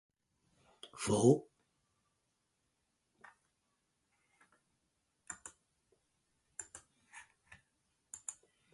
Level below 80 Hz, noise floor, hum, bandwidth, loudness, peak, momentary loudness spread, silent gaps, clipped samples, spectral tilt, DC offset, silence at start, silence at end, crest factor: -74 dBFS; -83 dBFS; none; 11.5 kHz; -34 LUFS; -14 dBFS; 27 LU; none; under 0.1%; -5.5 dB/octave; under 0.1%; 0.95 s; 0.4 s; 28 dB